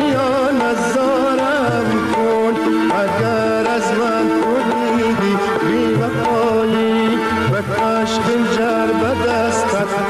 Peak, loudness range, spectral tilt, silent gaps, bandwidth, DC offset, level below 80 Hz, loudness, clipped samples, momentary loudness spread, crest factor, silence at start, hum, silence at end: -8 dBFS; 0 LU; -5.5 dB/octave; none; 13.5 kHz; under 0.1%; -48 dBFS; -16 LUFS; under 0.1%; 1 LU; 8 dB; 0 s; none; 0 s